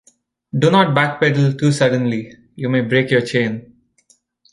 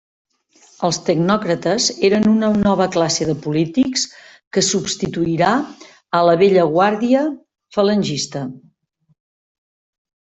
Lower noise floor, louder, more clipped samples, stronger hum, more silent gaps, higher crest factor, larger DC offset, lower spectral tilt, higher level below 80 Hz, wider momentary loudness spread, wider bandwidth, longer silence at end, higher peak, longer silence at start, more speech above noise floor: about the same, -58 dBFS vs -61 dBFS; about the same, -17 LUFS vs -17 LUFS; neither; neither; second, none vs 4.47-4.51 s; about the same, 16 dB vs 16 dB; neither; first, -6.5 dB/octave vs -4.5 dB/octave; second, -58 dBFS vs -52 dBFS; first, 13 LU vs 10 LU; first, 11.5 kHz vs 8.4 kHz; second, 0.9 s vs 1.75 s; about the same, -2 dBFS vs -2 dBFS; second, 0.55 s vs 0.8 s; about the same, 42 dB vs 45 dB